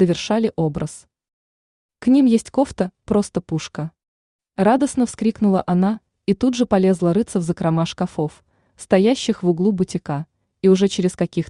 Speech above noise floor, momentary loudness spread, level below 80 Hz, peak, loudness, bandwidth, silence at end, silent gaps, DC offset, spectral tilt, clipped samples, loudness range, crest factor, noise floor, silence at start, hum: over 72 dB; 11 LU; -52 dBFS; -4 dBFS; -19 LUFS; 11 kHz; 0.05 s; 1.33-1.89 s, 4.08-4.39 s; under 0.1%; -6.5 dB/octave; under 0.1%; 2 LU; 16 dB; under -90 dBFS; 0 s; none